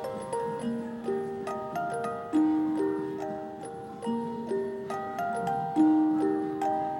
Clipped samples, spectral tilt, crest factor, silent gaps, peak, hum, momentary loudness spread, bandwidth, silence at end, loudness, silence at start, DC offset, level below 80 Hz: under 0.1%; -7 dB/octave; 16 dB; none; -14 dBFS; none; 10 LU; 12 kHz; 0 s; -30 LUFS; 0 s; under 0.1%; -68 dBFS